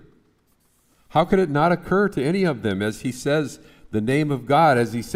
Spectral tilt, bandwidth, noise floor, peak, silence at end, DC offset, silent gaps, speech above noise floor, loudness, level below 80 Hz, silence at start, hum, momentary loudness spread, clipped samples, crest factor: -6.5 dB/octave; 16 kHz; -63 dBFS; -6 dBFS; 0 s; under 0.1%; none; 43 dB; -21 LUFS; -48 dBFS; 1.15 s; none; 9 LU; under 0.1%; 16 dB